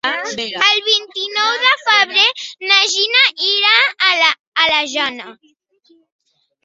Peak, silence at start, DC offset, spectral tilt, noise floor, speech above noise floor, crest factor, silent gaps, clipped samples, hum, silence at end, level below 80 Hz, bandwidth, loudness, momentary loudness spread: 0 dBFS; 0.05 s; under 0.1%; 1 dB/octave; -55 dBFS; 39 dB; 16 dB; 4.40-4.52 s; under 0.1%; none; 1.35 s; -66 dBFS; 8.4 kHz; -13 LUFS; 10 LU